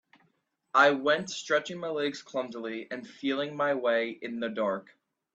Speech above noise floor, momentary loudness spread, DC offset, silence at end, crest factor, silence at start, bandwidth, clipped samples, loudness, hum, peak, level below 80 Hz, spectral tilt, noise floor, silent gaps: 44 dB; 14 LU; under 0.1%; 0.55 s; 22 dB; 0.75 s; 8.4 kHz; under 0.1%; -29 LUFS; none; -8 dBFS; -78 dBFS; -4 dB/octave; -73 dBFS; none